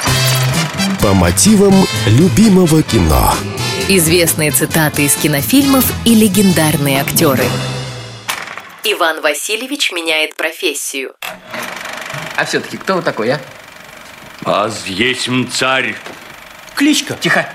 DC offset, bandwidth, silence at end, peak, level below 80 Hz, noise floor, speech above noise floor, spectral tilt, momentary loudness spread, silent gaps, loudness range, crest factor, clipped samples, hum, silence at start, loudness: under 0.1%; 16.5 kHz; 0 s; 0 dBFS; -32 dBFS; -35 dBFS; 22 dB; -4 dB/octave; 15 LU; none; 8 LU; 14 dB; under 0.1%; none; 0 s; -13 LUFS